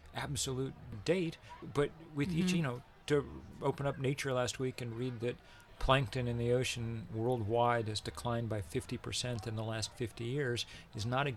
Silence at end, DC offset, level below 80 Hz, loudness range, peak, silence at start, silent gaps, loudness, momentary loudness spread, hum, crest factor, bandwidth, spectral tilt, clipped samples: 0 s; under 0.1%; -54 dBFS; 3 LU; -14 dBFS; 0 s; none; -36 LUFS; 9 LU; none; 22 dB; 15 kHz; -5 dB/octave; under 0.1%